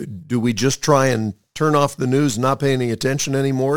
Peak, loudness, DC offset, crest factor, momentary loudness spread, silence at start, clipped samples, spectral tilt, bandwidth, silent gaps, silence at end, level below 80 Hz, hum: -2 dBFS; -19 LUFS; 0.7%; 16 dB; 6 LU; 0 s; under 0.1%; -5 dB/octave; 19 kHz; none; 0 s; -52 dBFS; none